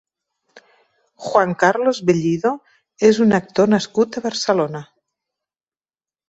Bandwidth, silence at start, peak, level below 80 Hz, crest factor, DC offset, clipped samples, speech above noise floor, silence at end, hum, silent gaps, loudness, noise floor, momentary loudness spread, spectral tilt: 8.2 kHz; 0.55 s; -2 dBFS; -60 dBFS; 18 dB; under 0.1%; under 0.1%; over 73 dB; 1.45 s; none; none; -18 LUFS; under -90 dBFS; 9 LU; -5.5 dB/octave